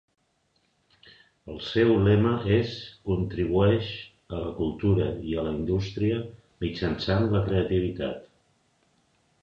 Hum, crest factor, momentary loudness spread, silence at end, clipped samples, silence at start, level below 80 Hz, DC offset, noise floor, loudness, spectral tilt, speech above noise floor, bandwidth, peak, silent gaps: none; 18 dB; 14 LU; 1.15 s; under 0.1%; 1.05 s; -44 dBFS; under 0.1%; -70 dBFS; -26 LUFS; -8.5 dB/octave; 45 dB; 7 kHz; -10 dBFS; none